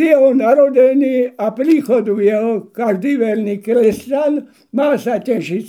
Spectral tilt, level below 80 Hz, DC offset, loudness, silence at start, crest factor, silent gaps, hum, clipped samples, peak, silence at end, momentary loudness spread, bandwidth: -7 dB/octave; -62 dBFS; under 0.1%; -15 LUFS; 0 s; 14 dB; none; none; under 0.1%; 0 dBFS; 0 s; 8 LU; 15.5 kHz